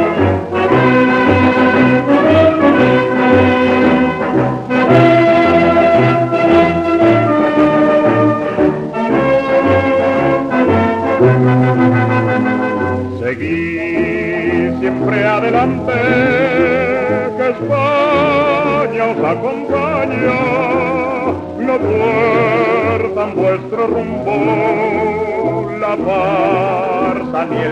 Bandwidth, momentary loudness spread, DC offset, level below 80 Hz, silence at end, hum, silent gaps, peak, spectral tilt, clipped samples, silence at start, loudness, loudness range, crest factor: 9 kHz; 7 LU; under 0.1%; -46 dBFS; 0 s; none; none; 0 dBFS; -8 dB/octave; under 0.1%; 0 s; -13 LUFS; 5 LU; 12 dB